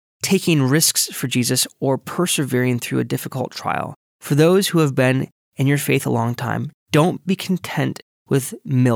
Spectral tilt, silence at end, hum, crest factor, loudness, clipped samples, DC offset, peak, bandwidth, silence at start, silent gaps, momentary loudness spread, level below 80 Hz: -4.5 dB/octave; 0 s; none; 16 dB; -19 LUFS; under 0.1%; under 0.1%; -2 dBFS; 18 kHz; 0.25 s; 3.96-4.20 s, 5.32-5.52 s, 6.74-6.86 s, 8.02-8.26 s; 10 LU; -66 dBFS